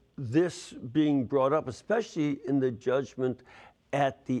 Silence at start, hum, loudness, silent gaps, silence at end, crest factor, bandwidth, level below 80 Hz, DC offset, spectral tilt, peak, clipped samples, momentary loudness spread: 0.2 s; none; -29 LUFS; none; 0 s; 16 dB; 10.5 kHz; -68 dBFS; under 0.1%; -7 dB/octave; -14 dBFS; under 0.1%; 7 LU